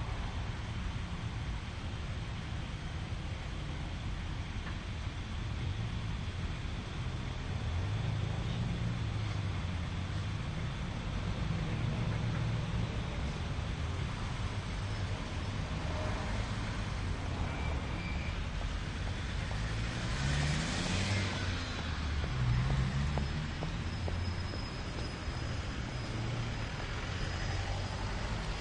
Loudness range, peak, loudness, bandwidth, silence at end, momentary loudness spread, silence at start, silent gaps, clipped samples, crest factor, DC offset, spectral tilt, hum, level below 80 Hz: 5 LU; -18 dBFS; -37 LUFS; 10.5 kHz; 0 s; 7 LU; 0 s; none; under 0.1%; 18 dB; under 0.1%; -5.5 dB/octave; none; -42 dBFS